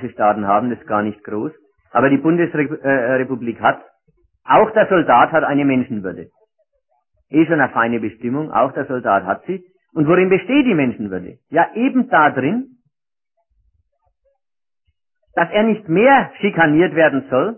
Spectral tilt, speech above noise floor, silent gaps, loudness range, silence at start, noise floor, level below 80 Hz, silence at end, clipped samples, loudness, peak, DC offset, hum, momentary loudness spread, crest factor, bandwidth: -11.5 dB/octave; 71 dB; none; 4 LU; 0 s; -87 dBFS; -58 dBFS; 0 s; under 0.1%; -16 LUFS; 0 dBFS; under 0.1%; none; 13 LU; 16 dB; 3.2 kHz